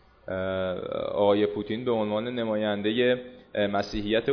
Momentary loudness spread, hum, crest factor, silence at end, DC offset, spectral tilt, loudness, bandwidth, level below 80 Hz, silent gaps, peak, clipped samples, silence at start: 7 LU; none; 18 dB; 0 s; under 0.1%; -6.5 dB/octave; -27 LUFS; 5.4 kHz; -52 dBFS; none; -10 dBFS; under 0.1%; 0.25 s